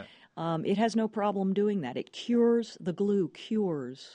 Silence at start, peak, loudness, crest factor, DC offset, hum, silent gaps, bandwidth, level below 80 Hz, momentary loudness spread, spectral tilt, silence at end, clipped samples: 0 s; -16 dBFS; -30 LUFS; 14 dB; under 0.1%; none; none; 10 kHz; -74 dBFS; 10 LU; -7 dB/octave; 0 s; under 0.1%